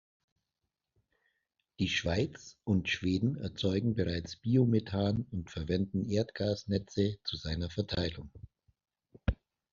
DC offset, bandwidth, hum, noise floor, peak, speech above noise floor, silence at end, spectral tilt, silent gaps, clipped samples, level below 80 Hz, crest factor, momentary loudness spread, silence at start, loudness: under 0.1%; 7.4 kHz; none; -87 dBFS; -16 dBFS; 55 dB; 0.4 s; -6 dB/octave; none; under 0.1%; -50 dBFS; 18 dB; 8 LU; 1.8 s; -33 LUFS